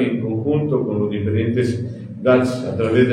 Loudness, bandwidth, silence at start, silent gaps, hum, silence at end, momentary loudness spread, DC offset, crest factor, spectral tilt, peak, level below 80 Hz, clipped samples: -19 LUFS; 10.5 kHz; 0 s; none; none; 0 s; 6 LU; under 0.1%; 16 dB; -8 dB/octave; -4 dBFS; -52 dBFS; under 0.1%